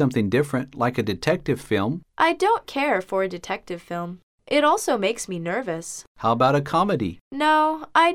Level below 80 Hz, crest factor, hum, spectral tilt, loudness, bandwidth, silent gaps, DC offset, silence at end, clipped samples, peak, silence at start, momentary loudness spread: -54 dBFS; 18 dB; none; -5 dB/octave; -23 LUFS; 16.5 kHz; 4.23-4.38 s, 6.07-6.15 s, 7.21-7.31 s; under 0.1%; 0 s; under 0.1%; -4 dBFS; 0 s; 11 LU